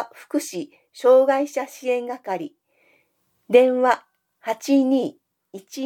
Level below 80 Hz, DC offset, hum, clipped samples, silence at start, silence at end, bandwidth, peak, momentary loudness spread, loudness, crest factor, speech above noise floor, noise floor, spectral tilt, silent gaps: -84 dBFS; under 0.1%; none; under 0.1%; 0 s; 0 s; 16 kHz; -2 dBFS; 17 LU; -21 LUFS; 20 dB; 48 dB; -68 dBFS; -4.5 dB/octave; none